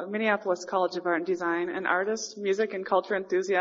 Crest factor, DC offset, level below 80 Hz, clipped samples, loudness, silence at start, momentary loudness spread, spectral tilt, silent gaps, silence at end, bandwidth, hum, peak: 18 dB; under 0.1%; -80 dBFS; under 0.1%; -28 LUFS; 0 s; 2 LU; -3 dB/octave; none; 0 s; 7.4 kHz; none; -10 dBFS